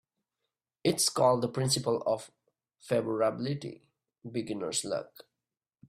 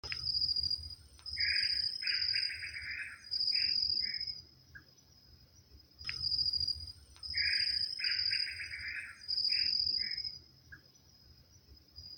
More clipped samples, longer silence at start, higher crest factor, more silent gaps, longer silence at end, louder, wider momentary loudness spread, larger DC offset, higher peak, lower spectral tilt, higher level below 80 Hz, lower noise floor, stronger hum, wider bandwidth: neither; first, 0.85 s vs 0.05 s; about the same, 20 dB vs 18 dB; neither; first, 0.8 s vs 0 s; first, -30 LUFS vs -33 LUFS; about the same, 12 LU vs 13 LU; neither; first, -12 dBFS vs -18 dBFS; first, -4 dB/octave vs -0.5 dB/octave; second, -68 dBFS vs -60 dBFS; first, under -90 dBFS vs -62 dBFS; neither; about the same, 15.5 kHz vs 17 kHz